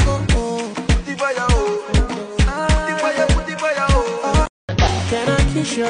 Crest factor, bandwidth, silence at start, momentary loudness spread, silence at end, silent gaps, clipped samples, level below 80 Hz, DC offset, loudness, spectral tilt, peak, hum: 14 dB; 10.5 kHz; 0 s; 4 LU; 0 s; 4.49-4.68 s; under 0.1%; -22 dBFS; under 0.1%; -19 LUFS; -5 dB/octave; -4 dBFS; none